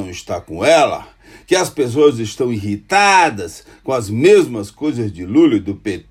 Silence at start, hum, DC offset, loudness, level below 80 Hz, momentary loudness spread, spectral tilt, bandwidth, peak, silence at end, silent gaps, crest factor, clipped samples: 0 s; none; under 0.1%; -15 LUFS; -50 dBFS; 14 LU; -4.5 dB/octave; 15.5 kHz; 0 dBFS; 0.1 s; none; 16 dB; under 0.1%